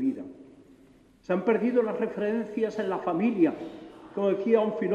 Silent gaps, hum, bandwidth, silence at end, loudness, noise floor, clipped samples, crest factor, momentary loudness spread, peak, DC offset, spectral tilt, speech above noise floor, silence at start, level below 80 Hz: none; none; 7.6 kHz; 0 s; -27 LUFS; -57 dBFS; under 0.1%; 18 dB; 16 LU; -10 dBFS; under 0.1%; -8 dB/octave; 31 dB; 0 s; -68 dBFS